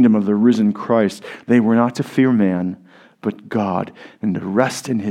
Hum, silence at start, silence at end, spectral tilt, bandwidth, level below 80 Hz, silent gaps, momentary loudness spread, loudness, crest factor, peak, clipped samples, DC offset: none; 0 s; 0 s; -7 dB/octave; 13 kHz; -66 dBFS; none; 12 LU; -18 LUFS; 18 dB; 0 dBFS; under 0.1%; under 0.1%